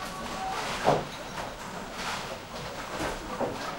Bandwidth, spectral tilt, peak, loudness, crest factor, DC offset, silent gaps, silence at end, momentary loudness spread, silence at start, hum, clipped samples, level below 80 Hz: 16 kHz; -4 dB/octave; -8 dBFS; -33 LUFS; 24 dB; under 0.1%; none; 0 s; 10 LU; 0 s; none; under 0.1%; -50 dBFS